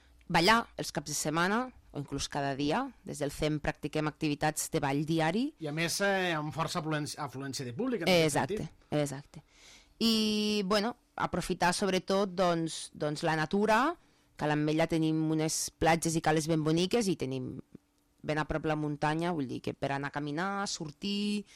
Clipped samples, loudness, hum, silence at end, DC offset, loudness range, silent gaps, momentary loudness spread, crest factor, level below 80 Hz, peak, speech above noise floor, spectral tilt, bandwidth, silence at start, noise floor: under 0.1%; -31 LUFS; none; 0.15 s; under 0.1%; 4 LU; none; 10 LU; 20 dB; -56 dBFS; -10 dBFS; 27 dB; -4.5 dB/octave; 16 kHz; 0.3 s; -58 dBFS